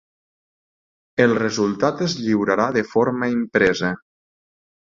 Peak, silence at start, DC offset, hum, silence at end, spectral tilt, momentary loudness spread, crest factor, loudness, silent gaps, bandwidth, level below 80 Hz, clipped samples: -2 dBFS; 1.15 s; under 0.1%; none; 1 s; -5.5 dB/octave; 6 LU; 20 dB; -20 LUFS; none; 7.6 kHz; -56 dBFS; under 0.1%